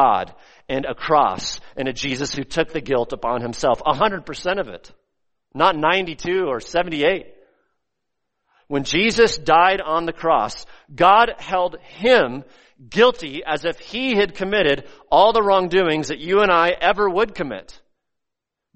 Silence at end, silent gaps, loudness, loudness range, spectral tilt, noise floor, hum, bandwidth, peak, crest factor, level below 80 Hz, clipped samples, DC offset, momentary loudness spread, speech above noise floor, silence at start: 1.15 s; none; -19 LUFS; 5 LU; -4 dB/octave; -83 dBFS; none; 8.4 kHz; -2 dBFS; 18 dB; -46 dBFS; under 0.1%; under 0.1%; 12 LU; 64 dB; 0 s